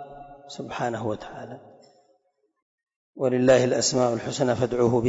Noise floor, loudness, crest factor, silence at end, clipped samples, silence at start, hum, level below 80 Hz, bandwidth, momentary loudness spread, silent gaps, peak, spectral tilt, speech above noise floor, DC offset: -70 dBFS; -24 LUFS; 16 dB; 0 s; under 0.1%; 0 s; none; -58 dBFS; 8 kHz; 23 LU; 2.62-2.78 s, 2.96-3.13 s; -8 dBFS; -5 dB/octave; 47 dB; under 0.1%